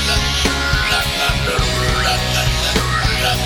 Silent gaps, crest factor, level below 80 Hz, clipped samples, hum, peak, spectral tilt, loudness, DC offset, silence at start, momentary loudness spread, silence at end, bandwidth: none; 16 dB; -24 dBFS; under 0.1%; none; -2 dBFS; -3 dB/octave; -16 LUFS; under 0.1%; 0 s; 1 LU; 0 s; 19 kHz